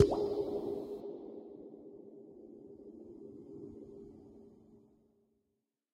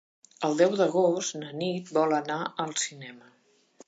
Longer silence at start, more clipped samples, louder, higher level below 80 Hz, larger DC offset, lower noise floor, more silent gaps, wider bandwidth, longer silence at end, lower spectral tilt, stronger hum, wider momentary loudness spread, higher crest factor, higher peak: second, 0 s vs 0.4 s; neither; second, -41 LUFS vs -27 LUFS; first, -62 dBFS vs -82 dBFS; neither; first, -85 dBFS vs -58 dBFS; neither; first, 10.5 kHz vs 9.2 kHz; first, 1.15 s vs 0.7 s; first, -7.5 dB/octave vs -4 dB/octave; neither; first, 20 LU vs 10 LU; first, 30 dB vs 20 dB; about the same, -10 dBFS vs -8 dBFS